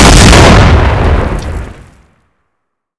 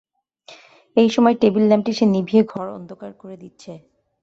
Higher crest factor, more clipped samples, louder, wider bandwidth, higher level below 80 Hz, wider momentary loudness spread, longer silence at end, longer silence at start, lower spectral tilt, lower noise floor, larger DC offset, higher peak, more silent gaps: second, 6 dB vs 18 dB; first, 10% vs under 0.1%; first, -5 LUFS vs -17 LUFS; first, 11 kHz vs 7.8 kHz; first, -12 dBFS vs -62 dBFS; second, 20 LU vs 23 LU; first, 1.3 s vs 0.45 s; second, 0 s vs 0.5 s; second, -4.5 dB/octave vs -7 dB/octave; first, -69 dBFS vs -48 dBFS; neither; about the same, 0 dBFS vs -2 dBFS; neither